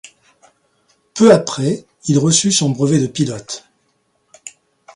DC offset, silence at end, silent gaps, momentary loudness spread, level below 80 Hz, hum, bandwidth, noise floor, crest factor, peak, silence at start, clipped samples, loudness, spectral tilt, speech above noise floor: under 0.1%; 0.45 s; none; 25 LU; -56 dBFS; none; 11.5 kHz; -64 dBFS; 18 dB; 0 dBFS; 1.15 s; under 0.1%; -15 LUFS; -4.5 dB/octave; 49 dB